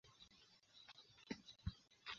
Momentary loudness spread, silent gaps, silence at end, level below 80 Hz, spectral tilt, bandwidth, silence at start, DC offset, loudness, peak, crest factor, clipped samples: 13 LU; none; 0 s; -66 dBFS; -3.5 dB/octave; 7.2 kHz; 0.05 s; under 0.1%; -57 LUFS; -32 dBFS; 24 dB; under 0.1%